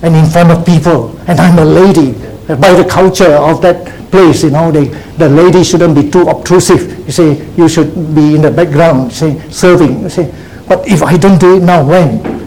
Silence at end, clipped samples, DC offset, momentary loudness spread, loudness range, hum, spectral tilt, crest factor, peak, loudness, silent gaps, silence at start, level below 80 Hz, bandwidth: 0 s; 4%; 1%; 8 LU; 2 LU; none; -6.5 dB/octave; 6 dB; 0 dBFS; -7 LUFS; none; 0 s; -32 dBFS; 19 kHz